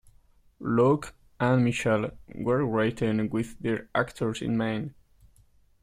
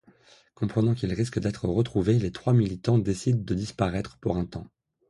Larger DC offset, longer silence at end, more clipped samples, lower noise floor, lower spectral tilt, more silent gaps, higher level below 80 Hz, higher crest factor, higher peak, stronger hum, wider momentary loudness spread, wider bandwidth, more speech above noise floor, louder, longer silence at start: neither; first, 0.9 s vs 0.45 s; neither; about the same, -60 dBFS vs -57 dBFS; about the same, -7 dB/octave vs -7.5 dB/octave; neither; second, -56 dBFS vs -46 dBFS; about the same, 18 dB vs 18 dB; about the same, -10 dBFS vs -10 dBFS; neither; first, 10 LU vs 7 LU; first, 14.5 kHz vs 11.5 kHz; about the same, 34 dB vs 32 dB; about the same, -27 LUFS vs -27 LUFS; about the same, 0.6 s vs 0.6 s